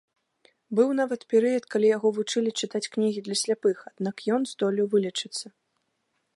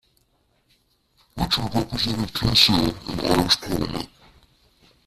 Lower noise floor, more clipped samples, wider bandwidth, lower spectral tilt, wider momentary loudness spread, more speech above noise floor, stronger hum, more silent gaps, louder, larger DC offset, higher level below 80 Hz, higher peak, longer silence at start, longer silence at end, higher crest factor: first, -76 dBFS vs -66 dBFS; neither; second, 11.5 kHz vs 15.5 kHz; about the same, -4 dB/octave vs -4 dB/octave; second, 8 LU vs 14 LU; first, 51 dB vs 44 dB; neither; neither; second, -26 LUFS vs -21 LUFS; neither; second, -80 dBFS vs -40 dBFS; second, -10 dBFS vs -2 dBFS; second, 0.7 s vs 1.35 s; second, 0.85 s vs 1 s; about the same, 18 dB vs 22 dB